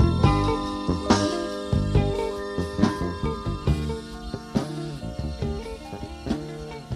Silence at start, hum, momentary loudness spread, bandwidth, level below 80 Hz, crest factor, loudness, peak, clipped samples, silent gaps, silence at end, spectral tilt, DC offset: 0 s; none; 13 LU; 13.5 kHz; -34 dBFS; 20 dB; -27 LUFS; -6 dBFS; under 0.1%; none; 0 s; -6.5 dB/octave; under 0.1%